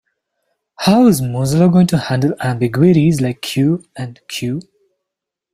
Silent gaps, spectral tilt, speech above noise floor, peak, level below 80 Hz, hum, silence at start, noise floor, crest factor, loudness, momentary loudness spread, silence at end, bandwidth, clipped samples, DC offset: none; -6.5 dB/octave; 68 dB; 0 dBFS; -50 dBFS; none; 0.8 s; -82 dBFS; 14 dB; -15 LUFS; 12 LU; 0.9 s; 15.5 kHz; under 0.1%; under 0.1%